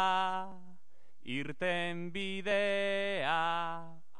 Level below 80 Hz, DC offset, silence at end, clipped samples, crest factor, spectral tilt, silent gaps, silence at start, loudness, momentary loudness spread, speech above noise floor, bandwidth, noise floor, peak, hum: -74 dBFS; 0.9%; 0.2 s; under 0.1%; 16 dB; -4.5 dB/octave; none; 0 s; -34 LUFS; 10 LU; 37 dB; 10 kHz; -71 dBFS; -18 dBFS; none